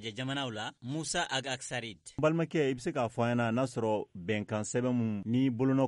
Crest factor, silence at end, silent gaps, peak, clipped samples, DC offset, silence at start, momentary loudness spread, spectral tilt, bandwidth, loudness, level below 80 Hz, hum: 16 dB; 0 s; none; -16 dBFS; under 0.1%; under 0.1%; 0 s; 8 LU; -5.5 dB/octave; 11.5 kHz; -32 LUFS; -64 dBFS; none